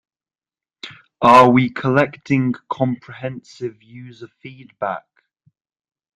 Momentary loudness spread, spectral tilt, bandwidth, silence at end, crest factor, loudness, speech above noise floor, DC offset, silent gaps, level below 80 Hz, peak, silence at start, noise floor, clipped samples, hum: 27 LU; -7 dB/octave; 11 kHz; 1.15 s; 20 dB; -16 LUFS; over 72 dB; under 0.1%; none; -56 dBFS; 0 dBFS; 0.85 s; under -90 dBFS; under 0.1%; none